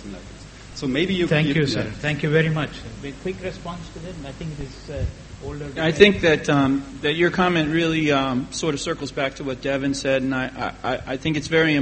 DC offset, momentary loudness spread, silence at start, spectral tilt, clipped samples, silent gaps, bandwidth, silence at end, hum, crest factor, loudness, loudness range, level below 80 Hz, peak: under 0.1%; 16 LU; 0 s; -5.5 dB/octave; under 0.1%; none; 8.8 kHz; 0 s; none; 22 dB; -21 LUFS; 8 LU; -42 dBFS; 0 dBFS